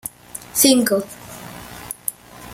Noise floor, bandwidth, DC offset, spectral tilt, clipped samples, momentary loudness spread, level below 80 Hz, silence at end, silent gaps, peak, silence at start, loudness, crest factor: -37 dBFS; 16.5 kHz; under 0.1%; -2.5 dB/octave; under 0.1%; 22 LU; -54 dBFS; 0 s; none; 0 dBFS; 0.35 s; -18 LUFS; 22 dB